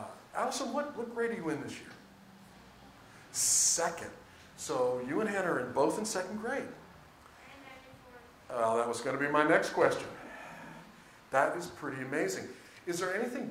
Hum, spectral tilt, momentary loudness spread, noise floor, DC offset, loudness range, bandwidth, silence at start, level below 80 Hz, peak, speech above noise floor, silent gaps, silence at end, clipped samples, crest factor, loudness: none; -2.5 dB/octave; 24 LU; -56 dBFS; under 0.1%; 6 LU; 16 kHz; 0 s; -70 dBFS; -10 dBFS; 24 dB; none; 0 s; under 0.1%; 24 dB; -32 LUFS